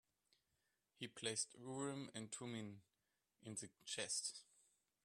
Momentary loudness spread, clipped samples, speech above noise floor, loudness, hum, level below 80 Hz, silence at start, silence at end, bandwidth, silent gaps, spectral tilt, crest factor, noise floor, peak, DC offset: 13 LU; under 0.1%; 40 dB; -48 LUFS; none; under -90 dBFS; 1 s; 0.6 s; 14 kHz; none; -2.5 dB/octave; 24 dB; -89 dBFS; -28 dBFS; under 0.1%